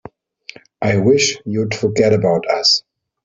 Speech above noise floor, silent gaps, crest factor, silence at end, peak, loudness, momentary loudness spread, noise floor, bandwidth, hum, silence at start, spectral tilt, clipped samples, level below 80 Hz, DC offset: 26 dB; none; 16 dB; 0.45 s; -2 dBFS; -15 LUFS; 7 LU; -41 dBFS; 7.8 kHz; none; 0.8 s; -4 dB/octave; under 0.1%; -52 dBFS; under 0.1%